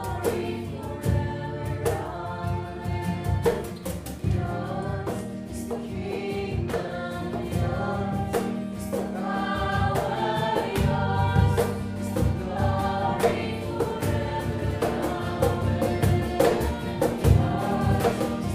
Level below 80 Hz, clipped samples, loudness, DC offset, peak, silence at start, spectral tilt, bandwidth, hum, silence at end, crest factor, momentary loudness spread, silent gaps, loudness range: -38 dBFS; under 0.1%; -27 LUFS; under 0.1%; -6 dBFS; 0 s; -6.5 dB/octave; 16 kHz; none; 0 s; 20 dB; 9 LU; none; 6 LU